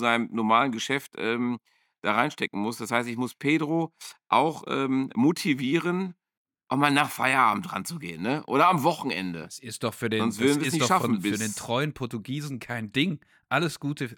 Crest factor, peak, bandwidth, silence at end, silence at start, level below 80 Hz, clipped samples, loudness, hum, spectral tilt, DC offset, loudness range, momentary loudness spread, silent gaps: 22 dB; -4 dBFS; 19 kHz; 0.05 s; 0 s; -70 dBFS; under 0.1%; -26 LUFS; none; -4.5 dB/octave; under 0.1%; 3 LU; 11 LU; 6.37-6.45 s